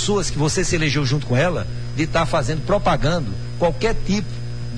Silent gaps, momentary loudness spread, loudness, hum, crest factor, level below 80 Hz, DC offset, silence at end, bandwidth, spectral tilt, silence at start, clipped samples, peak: none; 7 LU; -21 LUFS; 60 Hz at -30 dBFS; 14 dB; -30 dBFS; 3%; 0 s; 10.5 kHz; -5 dB/octave; 0 s; under 0.1%; -6 dBFS